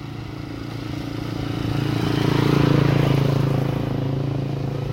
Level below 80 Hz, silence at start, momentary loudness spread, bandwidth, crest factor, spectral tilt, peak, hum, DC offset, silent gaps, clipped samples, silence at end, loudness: -40 dBFS; 0 s; 13 LU; 16 kHz; 16 dB; -7.5 dB/octave; -4 dBFS; none; under 0.1%; none; under 0.1%; 0 s; -22 LUFS